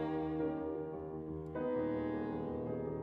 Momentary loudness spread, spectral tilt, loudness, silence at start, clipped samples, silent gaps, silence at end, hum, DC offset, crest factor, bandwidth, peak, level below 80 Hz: 7 LU; -10.5 dB/octave; -39 LUFS; 0 s; under 0.1%; none; 0 s; none; under 0.1%; 12 dB; 4.6 kHz; -26 dBFS; -60 dBFS